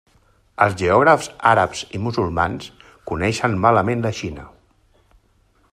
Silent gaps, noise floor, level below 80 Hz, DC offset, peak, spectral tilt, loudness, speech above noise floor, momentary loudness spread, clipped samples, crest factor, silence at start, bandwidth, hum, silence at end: none; -59 dBFS; -48 dBFS; under 0.1%; 0 dBFS; -5.5 dB/octave; -19 LUFS; 41 dB; 17 LU; under 0.1%; 20 dB; 0.6 s; 13.5 kHz; none; 1.25 s